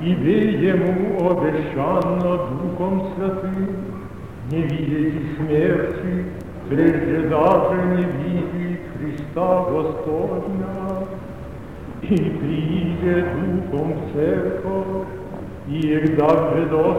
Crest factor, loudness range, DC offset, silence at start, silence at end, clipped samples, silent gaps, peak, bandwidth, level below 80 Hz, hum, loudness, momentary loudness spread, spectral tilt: 18 dB; 4 LU; 0.6%; 0 s; 0 s; under 0.1%; none; -2 dBFS; 10.5 kHz; -44 dBFS; none; -21 LUFS; 13 LU; -9 dB/octave